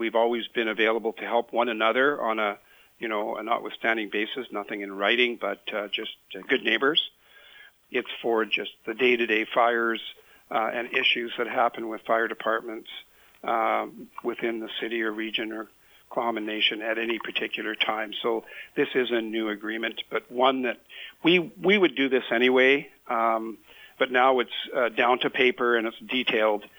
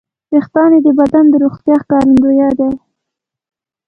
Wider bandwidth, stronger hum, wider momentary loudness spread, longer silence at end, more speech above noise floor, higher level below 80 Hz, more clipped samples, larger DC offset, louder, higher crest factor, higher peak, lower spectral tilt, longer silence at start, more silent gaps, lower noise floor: first, over 20 kHz vs 5.6 kHz; neither; first, 12 LU vs 7 LU; second, 0.1 s vs 1.1 s; second, 26 dB vs 70 dB; second, -74 dBFS vs -46 dBFS; neither; neither; second, -25 LUFS vs -10 LUFS; first, 20 dB vs 10 dB; second, -6 dBFS vs 0 dBFS; second, -5 dB/octave vs -8.5 dB/octave; second, 0 s vs 0.3 s; neither; second, -52 dBFS vs -79 dBFS